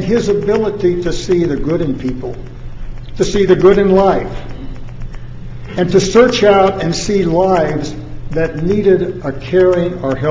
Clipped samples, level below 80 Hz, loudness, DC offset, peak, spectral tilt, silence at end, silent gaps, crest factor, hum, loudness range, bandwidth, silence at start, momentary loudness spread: under 0.1%; -30 dBFS; -13 LUFS; under 0.1%; 0 dBFS; -6 dB/octave; 0 s; none; 14 dB; none; 2 LU; 7.8 kHz; 0 s; 21 LU